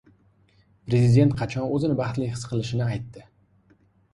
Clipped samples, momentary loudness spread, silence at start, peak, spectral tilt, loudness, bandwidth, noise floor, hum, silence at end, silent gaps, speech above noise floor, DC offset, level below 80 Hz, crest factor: under 0.1%; 13 LU; 0.85 s; -6 dBFS; -7.5 dB/octave; -24 LUFS; 11 kHz; -61 dBFS; none; 0.9 s; none; 38 dB; under 0.1%; -52 dBFS; 18 dB